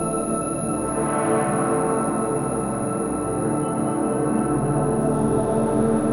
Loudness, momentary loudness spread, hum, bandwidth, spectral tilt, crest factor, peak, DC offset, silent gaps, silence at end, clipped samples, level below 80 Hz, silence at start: -22 LUFS; 4 LU; none; 14 kHz; -6.5 dB/octave; 14 dB; -8 dBFS; under 0.1%; none; 0 s; under 0.1%; -44 dBFS; 0 s